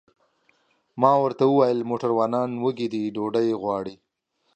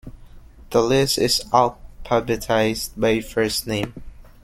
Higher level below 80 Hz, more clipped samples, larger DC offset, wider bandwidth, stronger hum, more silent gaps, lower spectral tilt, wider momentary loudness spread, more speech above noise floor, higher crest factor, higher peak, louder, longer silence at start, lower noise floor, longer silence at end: second, -70 dBFS vs -42 dBFS; neither; neither; second, 8.6 kHz vs 16.5 kHz; neither; neither; first, -8 dB/octave vs -4 dB/octave; first, 9 LU vs 6 LU; first, 50 dB vs 22 dB; about the same, 20 dB vs 20 dB; about the same, -4 dBFS vs -2 dBFS; second, -23 LUFS vs -20 LUFS; first, 0.95 s vs 0.05 s; first, -72 dBFS vs -43 dBFS; first, 0.6 s vs 0.2 s